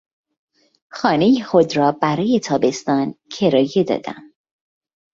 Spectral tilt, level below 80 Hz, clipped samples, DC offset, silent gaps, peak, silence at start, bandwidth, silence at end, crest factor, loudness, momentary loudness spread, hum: -6 dB/octave; -60 dBFS; under 0.1%; under 0.1%; none; -2 dBFS; 0.95 s; 7.8 kHz; 0.9 s; 18 dB; -18 LUFS; 10 LU; none